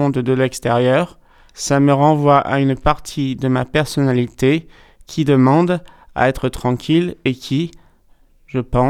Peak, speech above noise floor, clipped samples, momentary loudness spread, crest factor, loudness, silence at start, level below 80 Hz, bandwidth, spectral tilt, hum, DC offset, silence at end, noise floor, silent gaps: 0 dBFS; 35 dB; under 0.1%; 10 LU; 16 dB; -17 LUFS; 0 s; -38 dBFS; 15 kHz; -6.5 dB/octave; none; under 0.1%; 0 s; -51 dBFS; none